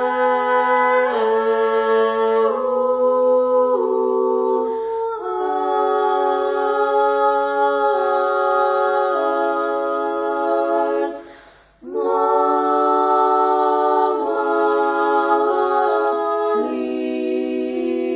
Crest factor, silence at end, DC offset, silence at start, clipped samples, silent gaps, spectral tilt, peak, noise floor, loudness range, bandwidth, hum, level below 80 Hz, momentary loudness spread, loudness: 14 dB; 0 s; under 0.1%; 0 s; under 0.1%; none; -7.5 dB/octave; -4 dBFS; -47 dBFS; 3 LU; 4 kHz; none; -60 dBFS; 6 LU; -18 LUFS